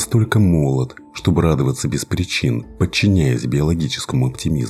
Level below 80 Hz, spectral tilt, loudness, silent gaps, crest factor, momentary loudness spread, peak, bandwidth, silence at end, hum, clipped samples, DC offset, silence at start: -34 dBFS; -6 dB/octave; -18 LUFS; none; 16 dB; 7 LU; -2 dBFS; 14.5 kHz; 0 s; none; under 0.1%; under 0.1%; 0 s